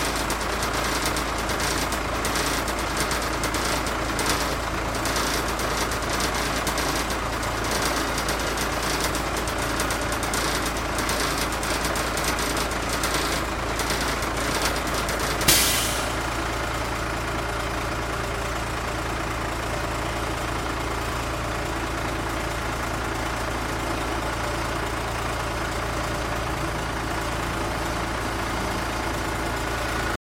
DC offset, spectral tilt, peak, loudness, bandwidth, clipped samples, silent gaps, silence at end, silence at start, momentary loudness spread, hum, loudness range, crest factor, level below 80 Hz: under 0.1%; -3 dB/octave; -2 dBFS; -25 LUFS; 16.5 kHz; under 0.1%; none; 0.05 s; 0 s; 4 LU; none; 5 LU; 24 dB; -34 dBFS